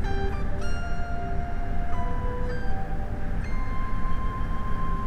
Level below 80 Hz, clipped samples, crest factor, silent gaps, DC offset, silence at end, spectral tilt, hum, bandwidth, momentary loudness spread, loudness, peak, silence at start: -28 dBFS; under 0.1%; 12 dB; none; under 0.1%; 0 s; -7.5 dB/octave; none; 6 kHz; 2 LU; -32 LUFS; -12 dBFS; 0 s